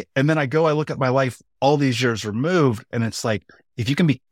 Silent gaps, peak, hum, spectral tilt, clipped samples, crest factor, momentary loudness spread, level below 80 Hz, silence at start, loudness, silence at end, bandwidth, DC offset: none; -6 dBFS; none; -6 dB/octave; under 0.1%; 14 dB; 7 LU; -60 dBFS; 0 s; -21 LUFS; 0.15 s; 15.5 kHz; under 0.1%